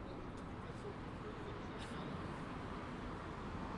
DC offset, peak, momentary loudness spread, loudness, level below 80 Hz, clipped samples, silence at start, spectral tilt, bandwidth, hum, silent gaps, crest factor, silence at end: under 0.1%; -34 dBFS; 3 LU; -47 LUFS; -56 dBFS; under 0.1%; 0 s; -6.5 dB/octave; 11.5 kHz; none; none; 12 dB; 0 s